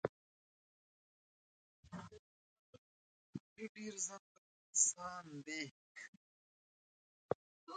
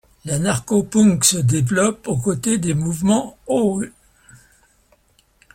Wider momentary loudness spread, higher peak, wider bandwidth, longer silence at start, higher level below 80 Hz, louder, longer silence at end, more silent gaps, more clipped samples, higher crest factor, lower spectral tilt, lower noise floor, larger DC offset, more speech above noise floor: first, 22 LU vs 8 LU; second, -18 dBFS vs 0 dBFS; second, 9.4 kHz vs 16.5 kHz; second, 0.05 s vs 0.25 s; second, -80 dBFS vs -50 dBFS; second, -41 LUFS vs -18 LUFS; second, 0 s vs 1.65 s; first, 0.09-1.83 s, 2.19-3.33 s, 3.40-3.56 s, 3.69-3.75 s, 4.19-4.73 s, 5.71-5.95 s, 6.08-7.29 s, 7.35-7.67 s vs none; neither; first, 28 dB vs 20 dB; second, -2 dB/octave vs -5 dB/octave; first, under -90 dBFS vs -58 dBFS; neither; first, over 48 dB vs 40 dB